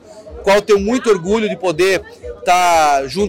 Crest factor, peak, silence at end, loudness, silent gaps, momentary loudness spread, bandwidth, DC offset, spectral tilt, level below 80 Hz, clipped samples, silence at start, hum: 10 dB; -4 dBFS; 0 s; -15 LUFS; none; 9 LU; 17 kHz; under 0.1%; -4 dB/octave; -40 dBFS; under 0.1%; 0.1 s; none